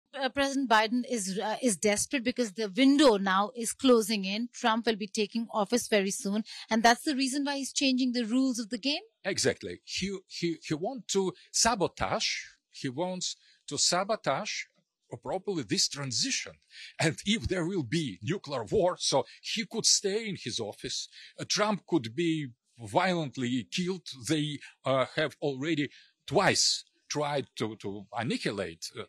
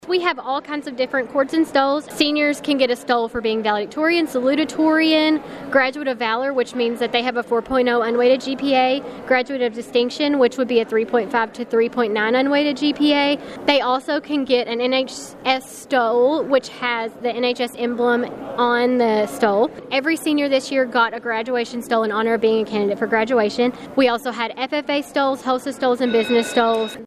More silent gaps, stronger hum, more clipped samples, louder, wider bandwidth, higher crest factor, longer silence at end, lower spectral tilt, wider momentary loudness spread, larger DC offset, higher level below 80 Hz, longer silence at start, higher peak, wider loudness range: neither; neither; neither; second, -29 LUFS vs -19 LUFS; about the same, 14 kHz vs 14 kHz; about the same, 20 dB vs 18 dB; about the same, 0.05 s vs 0 s; about the same, -3.5 dB/octave vs -4 dB/octave; first, 11 LU vs 6 LU; neither; about the same, -60 dBFS vs -58 dBFS; about the same, 0.15 s vs 0.05 s; second, -10 dBFS vs 0 dBFS; first, 5 LU vs 1 LU